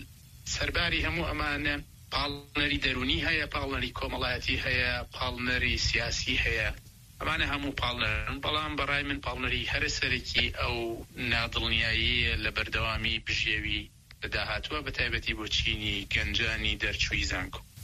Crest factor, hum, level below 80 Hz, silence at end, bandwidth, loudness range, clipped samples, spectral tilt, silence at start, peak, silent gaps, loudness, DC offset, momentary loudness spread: 18 dB; none; -40 dBFS; 0 s; 14.5 kHz; 2 LU; under 0.1%; -3.5 dB/octave; 0 s; -12 dBFS; none; -29 LUFS; under 0.1%; 7 LU